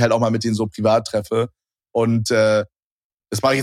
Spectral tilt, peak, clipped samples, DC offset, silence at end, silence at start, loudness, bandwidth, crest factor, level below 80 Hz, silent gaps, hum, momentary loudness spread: -5.5 dB/octave; -4 dBFS; under 0.1%; under 0.1%; 0 s; 0 s; -20 LUFS; 15.5 kHz; 16 dB; -58 dBFS; 2.82-3.10 s; none; 10 LU